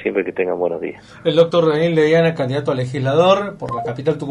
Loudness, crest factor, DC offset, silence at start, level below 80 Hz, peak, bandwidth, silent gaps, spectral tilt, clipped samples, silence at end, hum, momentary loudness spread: -17 LUFS; 16 dB; under 0.1%; 0 s; -56 dBFS; -2 dBFS; 10.5 kHz; none; -7 dB/octave; under 0.1%; 0 s; none; 10 LU